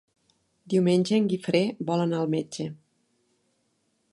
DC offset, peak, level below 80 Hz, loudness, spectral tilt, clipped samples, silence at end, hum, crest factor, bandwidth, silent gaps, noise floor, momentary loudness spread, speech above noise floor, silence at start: under 0.1%; -10 dBFS; -72 dBFS; -26 LUFS; -6.5 dB/octave; under 0.1%; 1.4 s; none; 18 dB; 11.5 kHz; none; -72 dBFS; 11 LU; 48 dB; 0.7 s